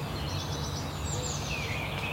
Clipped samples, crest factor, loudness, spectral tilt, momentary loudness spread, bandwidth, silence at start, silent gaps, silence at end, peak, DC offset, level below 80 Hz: under 0.1%; 14 dB; -33 LUFS; -4 dB/octave; 2 LU; 16 kHz; 0 s; none; 0 s; -20 dBFS; under 0.1%; -42 dBFS